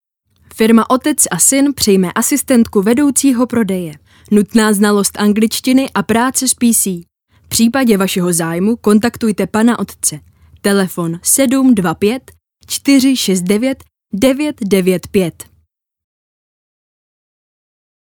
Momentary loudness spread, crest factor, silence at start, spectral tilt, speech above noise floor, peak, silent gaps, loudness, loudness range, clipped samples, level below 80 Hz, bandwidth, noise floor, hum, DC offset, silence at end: 7 LU; 14 dB; 0.55 s; -4 dB/octave; 46 dB; 0 dBFS; none; -13 LUFS; 5 LU; under 0.1%; -48 dBFS; 19.5 kHz; -59 dBFS; none; under 0.1%; 2.75 s